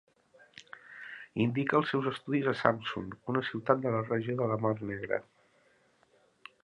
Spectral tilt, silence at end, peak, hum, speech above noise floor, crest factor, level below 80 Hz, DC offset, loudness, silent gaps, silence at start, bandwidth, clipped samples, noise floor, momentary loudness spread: -7.5 dB/octave; 1.45 s; -6 dBFS; none; 37 dB; 26 dB; -68 dBFS; under 0.1%; -32 LUFS; none; 0.75 s; 11 kHz; under 0.1%; -68 dBFS; 17 LU